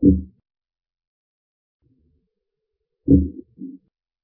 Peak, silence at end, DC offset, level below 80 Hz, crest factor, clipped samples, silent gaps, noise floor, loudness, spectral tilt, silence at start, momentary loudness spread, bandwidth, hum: -2 dBFS; 0.55 s; under 0.1%; -34 dBFS; 22 dB; under 0.1%; 1.07-1.80 s; -79 dBFS; -20 LUFS; -17.5 dB/octave; 0 s; 21 LU; 0.8 kHz; none